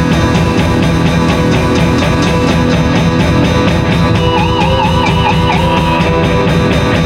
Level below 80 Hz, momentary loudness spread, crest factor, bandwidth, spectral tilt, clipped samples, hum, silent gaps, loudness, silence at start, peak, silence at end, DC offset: -22 dBFS; 1 LU; 10 dB; 14 kHz; -6 dB/octave; under 0.1%; none; none; -10 LUFS; 0 s; 0 dBFS; 0 s; under 0.1%